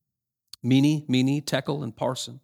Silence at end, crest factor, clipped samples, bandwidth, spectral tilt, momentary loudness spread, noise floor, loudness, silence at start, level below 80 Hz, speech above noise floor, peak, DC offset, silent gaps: 0.05 s; 18 dB; under 0.1%; 15.5 kHz; -6 dB/octave; 9 LU; -83 dBFS; -25 LUFS; 0.65 s; -68 dBFS; 59 dB; -8 dBFS; under 0.1%; none